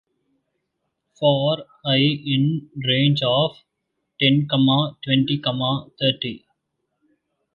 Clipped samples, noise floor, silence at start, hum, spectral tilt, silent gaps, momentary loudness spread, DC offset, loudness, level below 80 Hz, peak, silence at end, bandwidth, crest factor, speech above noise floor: under 0.1%; -77 dBFS; 1.2 s; none; -8 dB/octave; none; 7 LU; under 0.1%; -20 LUFS; -62 dBFS; -4 dBFS; 1.2 s; 5 kHz; 18 dB; 57 dB